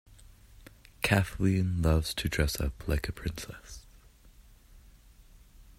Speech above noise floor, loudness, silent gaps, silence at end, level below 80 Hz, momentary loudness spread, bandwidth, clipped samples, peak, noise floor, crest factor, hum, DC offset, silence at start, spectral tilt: 27 dB; -30 LUFS; none; 0.15 s; -42 dBFS; 16 LU; 16 kHz; under 0.1%; -8 dBFS; -56 dBFS; 24 dB; none; under 0.1%; 1 s; -5.5 dB/octave